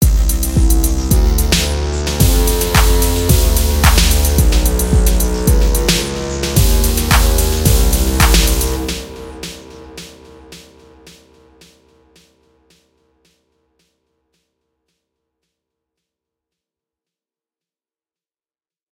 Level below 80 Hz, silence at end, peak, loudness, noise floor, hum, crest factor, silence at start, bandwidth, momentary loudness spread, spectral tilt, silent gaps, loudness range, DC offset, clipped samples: -16 dBFS; 8.35 s; 0 dBFS; -14 LUFS; under -90 dBFS; none; 16 dB; 0 s; 17.5 kHz; 17 LU; -4 dB/octave; none; 11 LU; under 0.1%; under 0.1%